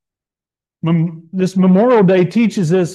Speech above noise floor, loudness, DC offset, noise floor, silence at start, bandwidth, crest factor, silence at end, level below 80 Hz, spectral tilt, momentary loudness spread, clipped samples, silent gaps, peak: over 77 dB; -14 LUFS; under 0.1%; under -90 dBFS; 0.85 s; 10.5 kHz; 12 dB; 0 s; -62 dBFS; -8 dB/octave; 10 LU; under 0.1%; none; -2 dBFS